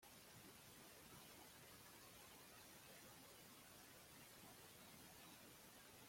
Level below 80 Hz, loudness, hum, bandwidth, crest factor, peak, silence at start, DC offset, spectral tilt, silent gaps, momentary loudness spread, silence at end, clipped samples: -84 dBFS; -62 LUFS; none; 16.5 kHz; 14 dB; -48 dBFS; 0 s; under 0.1%; -2.5 dB/octave; none; 1 LU; 0 s; under 0.1%